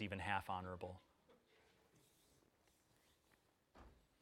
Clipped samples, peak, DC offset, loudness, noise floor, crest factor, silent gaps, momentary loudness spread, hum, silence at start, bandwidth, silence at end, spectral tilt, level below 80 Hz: under 0.1%; -24 dBFS; under 0.1%; -46 LUFS; -78 dBFS; 28 dB; none; 24 LU; none; 0 s; 16 kHz; 0.3 s; -5.5 dB/octave; -74 dBFS